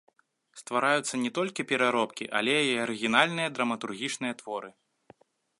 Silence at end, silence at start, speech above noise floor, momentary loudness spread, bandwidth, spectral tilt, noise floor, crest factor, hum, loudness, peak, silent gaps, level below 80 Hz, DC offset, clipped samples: 0.9 s; 0.55 s; 31 dB; 12 LU; 11.5 kHz; -3 dB/octave; -60 dBFS; 24 dB; none; -28 LUFS; -6 dBFS; none; -76 dBFS; under 0.1%; under 0.1%